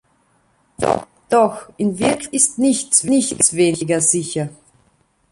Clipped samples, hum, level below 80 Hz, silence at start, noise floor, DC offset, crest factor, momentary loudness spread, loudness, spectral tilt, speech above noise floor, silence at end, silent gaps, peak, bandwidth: under 0.1%; none; -54 dBFS; 0.8 s; -60 dBFS; under 0.1%; 18 dB; 9 LU; -17 LUFS; -3.5 dB/octave; 43 dB; 0.8 s; none; 0 dBFS; 11.5 kHz